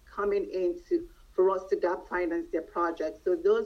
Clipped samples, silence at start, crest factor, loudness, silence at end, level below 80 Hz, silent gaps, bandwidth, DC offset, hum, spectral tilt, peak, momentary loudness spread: under 0.1%; 0.1 s; 14 dB; -30 LUFS; 0 s; -56 dBFS; none; 6.6 kHz; under 0.1%; none; -6.5 dB/octave; -14 dBFS; 6 LU